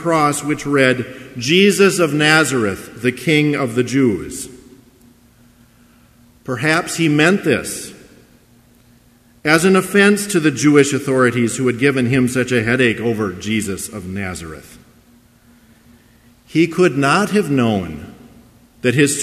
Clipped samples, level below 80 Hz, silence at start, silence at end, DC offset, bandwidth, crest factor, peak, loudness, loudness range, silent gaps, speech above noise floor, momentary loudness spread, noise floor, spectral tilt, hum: under 0.1%; -50 dBFS; 0 s; 0 s; under 0.1%; 15 kHz; 16 dB; 0 dBFS; -16 LUFS; 8 LU; none; 35 dB; 14 LU; -51 dBFS; -4.5 dB/octave; none